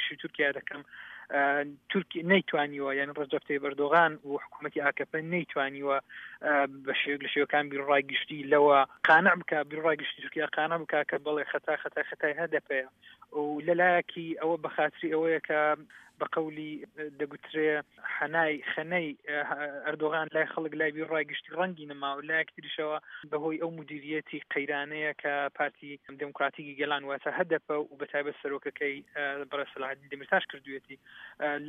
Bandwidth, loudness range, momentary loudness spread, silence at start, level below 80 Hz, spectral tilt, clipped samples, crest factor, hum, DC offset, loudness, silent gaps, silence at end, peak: 5.6 kHz; 8 LU; 12 LU; 0 s; -80 dBFS; -7 dB/octave; under 0.1%; 22 dB; none; under 0.1%; -30 LUFS; none; 0 s; -8 dBFS